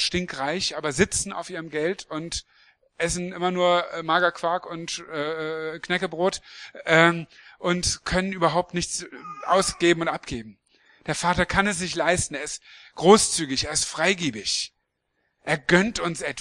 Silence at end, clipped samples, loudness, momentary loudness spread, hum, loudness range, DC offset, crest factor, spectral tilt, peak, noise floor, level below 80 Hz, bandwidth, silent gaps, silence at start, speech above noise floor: 0 s; under 0.1%; -24 LUFS; 13 LU; none; 4 LU; under 0.1%; 24 dB; -3.5 dB/octave; 0 dBFS; -75 dBFS; -48 dBFS; 12 kHz; none; 0 s; 51 dB